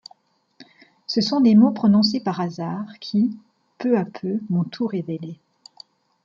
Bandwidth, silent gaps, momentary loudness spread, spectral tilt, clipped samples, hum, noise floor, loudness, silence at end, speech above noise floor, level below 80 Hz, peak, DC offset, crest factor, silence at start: 7.2 kHz; none; 16 LU; -7 dB/octave; under 0.1%; none; -57 dBFS; -21 LUFS; 0.9 s; 37 dB; -66 dBFS; -4 dBFS; under 0.1%; 18 dB; 0.6 s